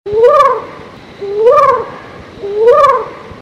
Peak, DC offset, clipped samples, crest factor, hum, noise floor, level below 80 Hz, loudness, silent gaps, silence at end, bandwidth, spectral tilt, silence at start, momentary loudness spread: 0 dBFS; under 0.1%; under 0.1%; 10 dB; none; -32 dBFS; -46 dBFS; -10 LUFS; none; 0 s; 9.2 kHz; -5 dB/octave; 0.05 s; 19 LU